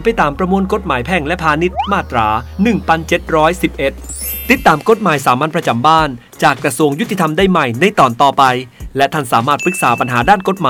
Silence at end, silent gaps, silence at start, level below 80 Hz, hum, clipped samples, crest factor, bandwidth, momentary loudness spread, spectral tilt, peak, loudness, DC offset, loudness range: 0 s; none; 0 s; -34 dBFS; none; 0.2%; 14 dB; 20 kHz; 6 LU; -5 dB/octave; 0 dBFS; -13 LUFS; under 0.1%; 2 LU